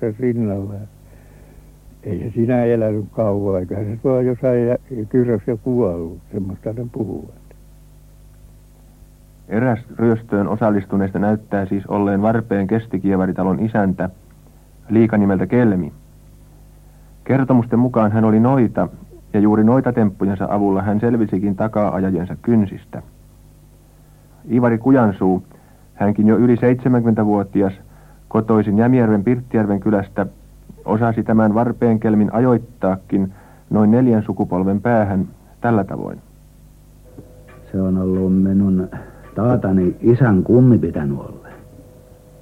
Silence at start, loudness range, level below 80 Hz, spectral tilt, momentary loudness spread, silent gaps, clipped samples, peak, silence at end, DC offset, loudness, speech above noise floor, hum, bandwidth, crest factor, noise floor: 0 s; 6 LU; -46 dBFS; -10.5 dB/octave; 12 LU; none; under 0.1%; -2 dBFS; 0.6 s; under 0.1%; -17 LUFS; 30 dB; 50 Hz at -45 dBFS; 4 kHz; 16 dB; -46 dBFS